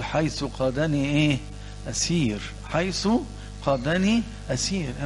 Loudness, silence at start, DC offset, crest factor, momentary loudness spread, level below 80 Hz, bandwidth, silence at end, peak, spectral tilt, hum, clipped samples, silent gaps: -25 LUFS; 0 s; under 0.1%; 18 dB; 9 LU; -40 dBFS; 11.5 kHz; 0 s; -8 dBFS; -5 dB/octave; 50 Hz at -35 dBFS; under 0.1%; none